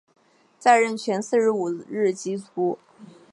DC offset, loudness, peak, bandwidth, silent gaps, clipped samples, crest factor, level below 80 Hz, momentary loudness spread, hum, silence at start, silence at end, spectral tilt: under 0.1%; -23 LUFS; -4 dBFS; 11.5 kHz; none; under 0.1%; 20 dB; -80 dBFS; 11 LU; none; 0.6 s; 0.3 s; -4.5 dB/octave